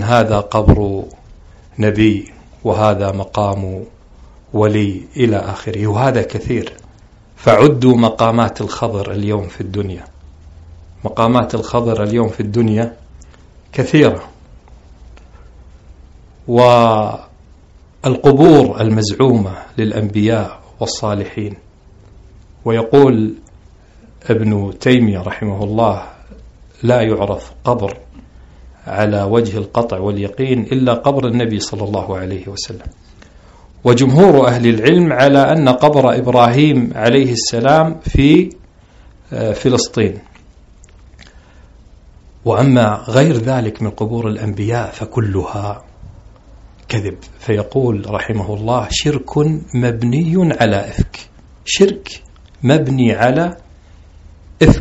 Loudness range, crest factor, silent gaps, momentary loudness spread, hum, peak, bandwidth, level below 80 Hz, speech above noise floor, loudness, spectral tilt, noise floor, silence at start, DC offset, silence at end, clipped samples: 8 LU; 14 dB; none; 14 LU; none; 0 dBFS; 8.2 kHz; -34 dBFS; 30 dB; -14 LUFS; -6.5 dB/octave; -43 dBFS; 0 s; under 0.1%; 0 s; 0.3%